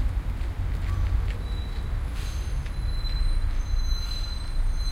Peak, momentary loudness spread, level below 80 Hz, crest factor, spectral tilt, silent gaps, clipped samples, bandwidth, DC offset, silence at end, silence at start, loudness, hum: -12 dBFS; 4 LU; -26 dBFS; 14 dB; -5 dB/octave; none; under 0.1%; 13 kHz; under 0.1%; 0 s; 0 s; -31 LUFS; none